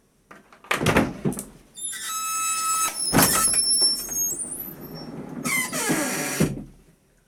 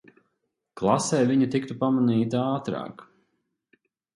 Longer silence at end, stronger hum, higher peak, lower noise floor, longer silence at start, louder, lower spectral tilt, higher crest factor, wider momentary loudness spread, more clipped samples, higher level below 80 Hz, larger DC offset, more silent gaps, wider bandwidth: second, 0.55 s vs 1.15 s; neither; about the same, -4 dBFS vs -6 dBFS; second, -57 dBFS vs -78 dBFS; second, 0.3 s vs 0.75 s; about the same, -22 LUFS vs -24 LUFS; second, -2.5 dB/octave vs -6 dB/octave; about the same, 22 dB vs 20 dB; first, 18 LU vs 10 LU; neither; first, -48 dBFS vs -64 dBFS; neither; neither; first, 19.5 kHz vs 11.5 kHz